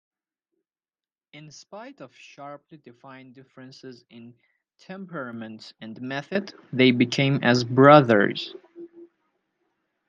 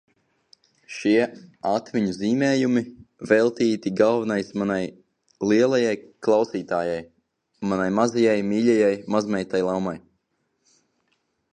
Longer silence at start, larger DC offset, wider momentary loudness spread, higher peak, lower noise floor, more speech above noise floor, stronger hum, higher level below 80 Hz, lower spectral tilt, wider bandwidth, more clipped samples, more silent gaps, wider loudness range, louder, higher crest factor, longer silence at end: first, 1.75 s vs 0.9 s; neither; first, 28 LU vs 10 LU; about the same, -2 dBFS vs -4 dBFS; first, under -90 dBFS vs -73 dBFS; first, over 66 dB vs 51 dB; neither; second, -72 dBFS vs -62 dBFS; about the same, -6.5 dB/octave vs -6 dB/octave; second, 7.4 kHz vs 9.8 kHz; neither; neither; first, 24 LU vs 2 LU; first, -20 LUFS vs -23 LUFS; about the same, 24 dB vs 20 dB; second, 1.2 s vs 1.55 s